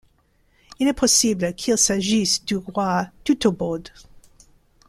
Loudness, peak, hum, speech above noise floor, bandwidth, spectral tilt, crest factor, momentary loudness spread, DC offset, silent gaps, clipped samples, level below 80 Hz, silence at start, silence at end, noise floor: -20 LUFS; -4 dBFS; none; 41 dB; 15 kHz; -3 dB/octave; 18 dB; 9 LU; under 0.1%; none; under 0.1%; -50 dBFS; 0.8 s; 0.7 s; -62 dBFS